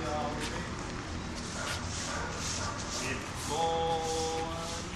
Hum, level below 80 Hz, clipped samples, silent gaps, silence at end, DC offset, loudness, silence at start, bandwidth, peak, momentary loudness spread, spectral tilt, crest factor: none; -46 dBFS; under 0.1%; none; 0 s; under 0.1%; -34 LUFS; 0 s; 14.5 kHz; -20 dBFS; 7 LU; -3.5 dB/octave; 16 dB